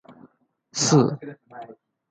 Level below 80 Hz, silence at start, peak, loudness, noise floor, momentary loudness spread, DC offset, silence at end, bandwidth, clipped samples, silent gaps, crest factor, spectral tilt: -66 dBFS; 0.75 s; -6 dBFS; -21 LUFS; -59 dBFS; 24 LU; under 0.1%; 0.4 s; 9.4 kHz; under 0.1%; none; 20 dB; -5 dB/octave